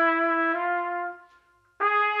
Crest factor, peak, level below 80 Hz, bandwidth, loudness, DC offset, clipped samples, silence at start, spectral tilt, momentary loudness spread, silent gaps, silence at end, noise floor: 14 dB; -12 dBFS; -78 dBFS; 5.8 kHz; -25 LUFS; under 0.1%; under 0.1%; 0 s; -4 dB/octave; 10 LU; none; 0 s; -61 dBFS